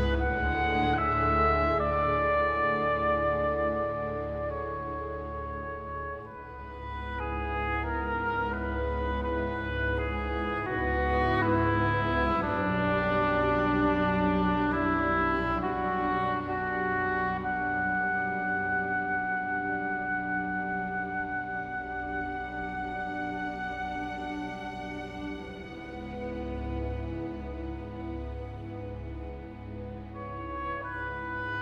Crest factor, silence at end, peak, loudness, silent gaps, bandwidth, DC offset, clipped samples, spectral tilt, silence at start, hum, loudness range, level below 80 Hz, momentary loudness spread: 16 dB; 0 s; -14 dBFS; -30 LUFS; none; 7.2 kHz; under 0.1%; under 0.1%; -8 dB/octave; 0 s; none; 11 LU; -40 dBFS; 13 LU